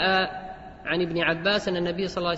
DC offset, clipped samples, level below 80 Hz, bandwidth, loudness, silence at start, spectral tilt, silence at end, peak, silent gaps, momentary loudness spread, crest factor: under 0.1%; under 0.1%; -52 dBFS; 8 kHz; -25 LUFS; 0 s; -5 dB/octave; 0 s; -10 dBFS; none; 14 LU; 16 dB